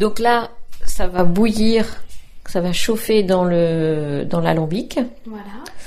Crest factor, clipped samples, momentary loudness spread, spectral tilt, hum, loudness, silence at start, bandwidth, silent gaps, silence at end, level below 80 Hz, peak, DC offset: 14 dB; under 0.1%; 17 LU; -5.5 dB/octave; none; -19 LUFS; 0 s; 15.5 kHz; none; 0 s; -32 dBFS; -2 dBFS; under 0.1%